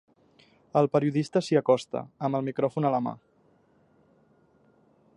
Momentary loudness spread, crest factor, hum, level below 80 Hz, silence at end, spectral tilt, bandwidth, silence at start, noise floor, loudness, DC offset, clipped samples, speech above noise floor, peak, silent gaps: 9 LU; 20 dB; none; -72 dBFS; 2 s; -7 dB/octave; 11 kHz; 0.75 s; -64 dBFS; -27 LUFS; under 0.1%; under 0.1%; 38 dB; -8 dBFS; none